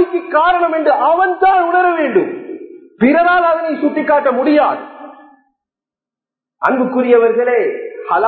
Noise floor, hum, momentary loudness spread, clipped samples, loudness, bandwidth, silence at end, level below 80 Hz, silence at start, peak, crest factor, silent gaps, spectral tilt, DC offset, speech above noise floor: -88 dBFS; none; 11 LU; under 0.1%; -13 LUFS; 4.5 kHz; 0 s; -56 dBFS; 0 s; 0 dBFS; 14 dB; none; -8.5 dB/octave; under 0.1%; 76 dB